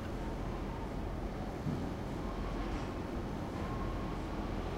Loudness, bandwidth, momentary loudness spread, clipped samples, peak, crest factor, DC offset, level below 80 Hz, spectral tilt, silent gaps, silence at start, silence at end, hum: -40 LUFS; 15.5 kHz; 2 LU; under 0.1%; -24 dBFS; 14 dB; under 0.1%; -44 dBFS; -7 dB/octave; none; 0 s; 0 s; none